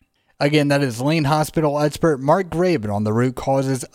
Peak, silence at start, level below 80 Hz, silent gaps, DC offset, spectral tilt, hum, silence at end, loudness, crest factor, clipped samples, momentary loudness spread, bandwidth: -2 dBFS; 0.4 s; -48 dBFS; none; under 0.1%; -6 dB/octave; none; 0.1 s; -19 LUFS; 16 dB; under 0.1%; 4 LU; 16.5 kHz